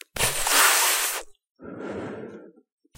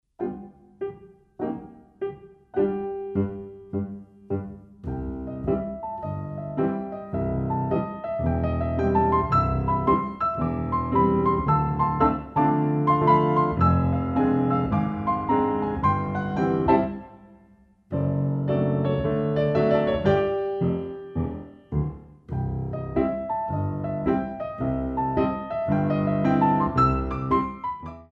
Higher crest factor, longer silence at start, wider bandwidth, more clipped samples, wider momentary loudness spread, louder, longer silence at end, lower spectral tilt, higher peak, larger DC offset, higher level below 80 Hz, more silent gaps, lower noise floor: about the same, 22 dB vs 18 dB; about the same, 0.15 s vs 0.2 s; first, 16 kHz vs 5.8 kHz; neither; first, 22 LU vs 12 LU; first, -20 LUFS vs -25 LUFS; first, 0.5 s vs 0.1 s; second, 0 dB/octave vs -10 dB/octave; about the same, -4 dBFS vs -6 dBFS; neither; second, -48 dBFS vs -40 dBFS; first, 1.51-1.55 s vs none; second, -44 dBFS vs -56 dBFS